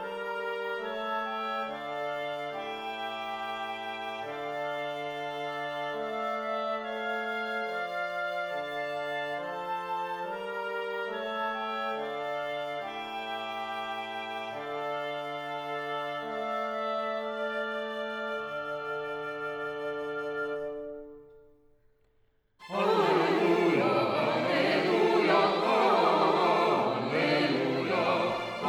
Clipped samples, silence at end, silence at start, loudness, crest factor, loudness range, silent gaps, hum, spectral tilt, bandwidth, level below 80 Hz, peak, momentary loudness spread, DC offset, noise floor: under 0.1%; 0 s; 0 s; -31 LUFS; 20 dB; 10 LU; none; none; -5.5 dB/octave; 19.5 kHz; -72 dBFS; -10 dBFS; 11 LU; under 0.1%; -68 dBFS